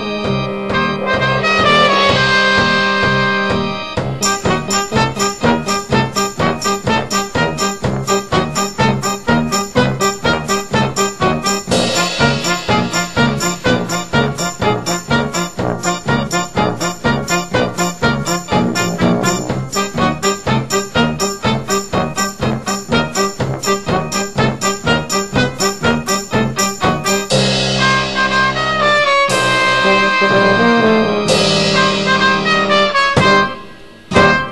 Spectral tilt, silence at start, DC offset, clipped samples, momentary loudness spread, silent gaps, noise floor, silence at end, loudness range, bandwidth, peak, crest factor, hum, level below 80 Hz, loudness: -4 dB/octave; 0 s; 1%; under 0.1%; 7 LU; none; -36 dBFS; 0 s; 5 LU; 12.5 kHz; 0 dBFS; 14 dB; none; -38 dBFS; -14 LUFS